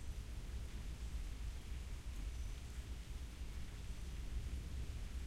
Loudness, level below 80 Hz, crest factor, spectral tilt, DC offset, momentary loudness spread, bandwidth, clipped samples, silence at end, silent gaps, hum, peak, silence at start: -50 LUFS; -46 dBFS; 12 dB; -5 dB/octave; under 0.1%; 3 LU; 15 kHz; under 0.1%; 0 s; none; none; -32 dBFS; 0 s